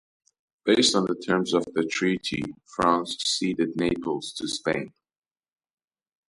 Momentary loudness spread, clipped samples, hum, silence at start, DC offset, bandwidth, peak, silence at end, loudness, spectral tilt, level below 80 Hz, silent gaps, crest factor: 10 LU; under 0.1%; none; 0.65 s; under 0.1%; 11.5 kHz; -6 dBFS; 1.4 s; -25 LUFS; -3.5 dB/octave; -58 dBFS; none; 20 dB